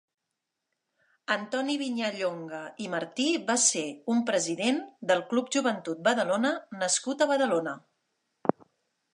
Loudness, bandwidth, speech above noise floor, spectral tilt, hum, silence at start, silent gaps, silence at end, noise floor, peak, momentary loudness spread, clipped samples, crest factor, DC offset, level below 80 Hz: -28 LUFS; 11.5 kHz; 57 dB; -2.5 dB/octave; none; 1.3 s; none; 0.65 s; -85 dBFS; -2 dBFS; 9 LU; under 0.1%; 26 dB; under 0.1%; -82 dBFS